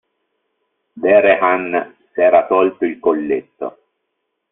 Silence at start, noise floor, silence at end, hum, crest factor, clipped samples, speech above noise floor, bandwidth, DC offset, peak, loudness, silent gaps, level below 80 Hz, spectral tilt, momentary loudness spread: 0.95 s; -73 dBFS; 0.8 s; none; 16 dB; under 0.1%; 59 dB; 3.9 kHz; under 0.1%; 0 dBFS; -15 LUFS; none; -60 dBFS; -3.5 dB/octave; 16 LU